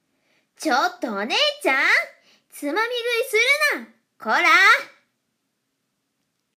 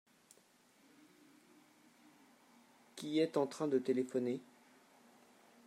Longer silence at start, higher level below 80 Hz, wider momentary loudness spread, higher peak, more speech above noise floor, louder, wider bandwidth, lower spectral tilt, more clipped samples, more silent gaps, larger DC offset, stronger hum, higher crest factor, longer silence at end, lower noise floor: second, 0.6 s vs 2.95 s; first, -84 dBFS vs under -90 dBFS; first, 16 LU vs 12 LU; first, -4 dBFS vs -22 dBFS; first, 55 dB vs 33 dB; first, -19 LUFS vs -37 LUFS; about the same, 15.5 kHz vs 14.5 kHz; second, -1 dB/octave vs -5.5 dB/octave; neither; neither; neither; neither; about the same, 18 dB vs 20 dB; first, 1.7 s vs 1.25 s; first, -75 dBFS vs -69 dBFS